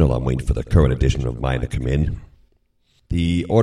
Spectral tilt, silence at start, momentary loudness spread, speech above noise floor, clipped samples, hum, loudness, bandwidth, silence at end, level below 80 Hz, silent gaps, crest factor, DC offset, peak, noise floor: -7.5 dB/octave; 0 s; 7 LU; 43 dB; under 0.1%; none; -21 LUFS; 11.5 kHz; 0 s; -26 dBFS; none; 18 dB; under 0.1%; 0 dBFS; -62 dBFS